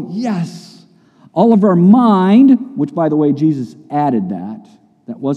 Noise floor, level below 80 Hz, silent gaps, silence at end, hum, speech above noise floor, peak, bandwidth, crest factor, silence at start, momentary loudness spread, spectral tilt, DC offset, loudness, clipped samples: -47 dBFS; -66 dBFS; none; 0 s; none; 35 dB; 0 dBFS; 8.6 kHz; 14 dB; 0 s; 16 LU; -9 dB/octave; under 0.1%; -13 LUFS; under 0.1%